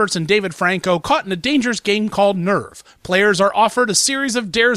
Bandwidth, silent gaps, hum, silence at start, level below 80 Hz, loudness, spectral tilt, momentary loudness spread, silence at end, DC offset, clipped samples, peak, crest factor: 15 kHz; none; none; 0 s; -52 dBFS; -17 LUFS; -3.5 dB/octave; 5 LU; 0 s; under 0.1%; under 0.1%; -2 dBFS; 14 dB